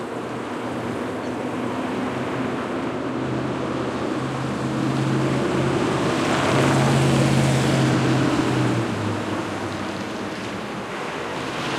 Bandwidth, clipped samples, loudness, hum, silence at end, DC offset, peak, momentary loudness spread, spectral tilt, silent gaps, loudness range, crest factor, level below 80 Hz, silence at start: 13.5 kHz; under 0.1%; -23 LUFS; none; 0 s; under 0.1%; -6 dBFS; 10 LU; -6 dB/octave; none; 7 LU; 16 dB; -52 dBFS; 0 s